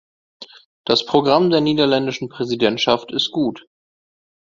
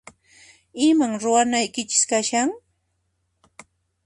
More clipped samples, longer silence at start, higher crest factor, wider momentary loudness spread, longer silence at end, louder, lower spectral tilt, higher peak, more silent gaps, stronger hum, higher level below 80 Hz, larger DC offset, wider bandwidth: neither; second, 0.4 s vs 0.75 s; about the same, 20 dB vs 20 dB; about the same, 9 LU vs 8 LU; second, 0.8 s vs 1.5 s; about the same, -18 LUFS vs -20 LUFS; first, -5.5 dB/octave vs -2 dB/octave; first, 0 dBFS vs -4 dBFS; first, 0.65-0.84 s vs none; neither; first, -58 dBFS vs -66 dBFS; neither; second, 7.6 kHz vs 11.5 kHz